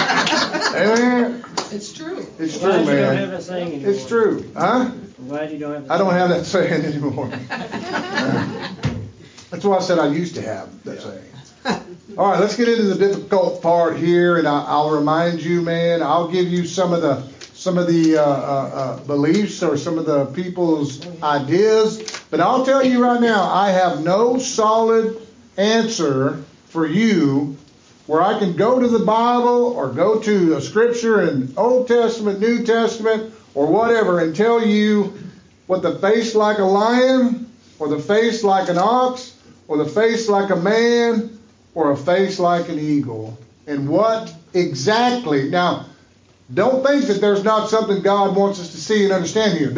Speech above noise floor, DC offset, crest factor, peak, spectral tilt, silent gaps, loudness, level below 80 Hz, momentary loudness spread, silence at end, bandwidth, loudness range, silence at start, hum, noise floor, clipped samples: 34 dB; under 0.1%; 14 dB; -4 dBFS; -5.5 dB/octave; none; -18 LUFS; -58 dBFS; 12 LU; 0 s; 7.6 kHz; 4 LU; 0 s; none; -52 dBFS; under 0.1%